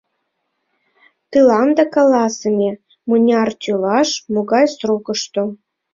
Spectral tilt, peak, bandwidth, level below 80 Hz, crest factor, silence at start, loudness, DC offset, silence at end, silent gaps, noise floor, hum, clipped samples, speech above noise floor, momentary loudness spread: -4.5 dB/octave; -2 dBFS; 7.6 kHz; -62 dBFS; 14 dB; 1.3 s; -16 LUFS; under 0.1%; 0.4 s; none; -71 dBFS; none; under 0.1%; 56 dB; 9 LU